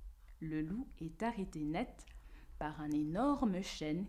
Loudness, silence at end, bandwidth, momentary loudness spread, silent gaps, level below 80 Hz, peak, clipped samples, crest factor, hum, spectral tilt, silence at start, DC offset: -40 LUFS; 0 s; 14 kHz; 23 LU; none; -54 dBFS; -24 dBFS; under 0.1%; 16 dB; none; -6.5 dB/octave; 0 s; under 0.1%